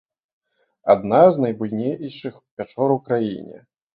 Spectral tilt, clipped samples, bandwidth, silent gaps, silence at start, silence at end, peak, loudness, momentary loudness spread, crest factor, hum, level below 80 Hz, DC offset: -12 dB/octave; under 0.1%; 4.9 kHz; 2.51-2.57 s; 0.85 s; 0.4 s; -2 dBFS; -19 LUFS; 20 LU; 18 dB; none; -62 dBFS; under 0.1%